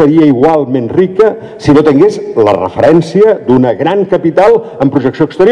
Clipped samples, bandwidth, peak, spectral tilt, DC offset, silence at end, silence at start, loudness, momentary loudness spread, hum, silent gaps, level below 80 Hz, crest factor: 6%; 10 kHz; 0 dBFS; -8 dB/octave; under 0.1%; 0 s; 0 s; -9 LUFS; 5 LU; none; none; -42 dBFS; 8 dB